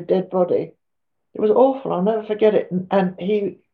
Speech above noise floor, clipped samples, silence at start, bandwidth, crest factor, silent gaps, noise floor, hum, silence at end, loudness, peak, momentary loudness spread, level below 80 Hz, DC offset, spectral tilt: 64 dB; under 0.1%; 0 s; 4.7 kHz; 16 dB; none; -83 dBFS; none; 0.2 s; -20 LUFS; -4 dBFS; 7 LU; -68 dBFS; under 0.1%; -6.5 dB/octave